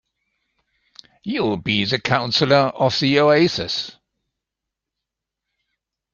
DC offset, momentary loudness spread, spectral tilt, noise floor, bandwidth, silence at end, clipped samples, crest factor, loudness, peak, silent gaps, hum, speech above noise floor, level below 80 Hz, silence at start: under 0.1%; 11 LU; -5.5 dB/octave; -84 dBFS; 7.4 kHz; 2.25 s; under 0.1%; 20 dB; -18 LUFS; -2 dBFS; none; none; 66 dB; -56 dBFS; 1.25 s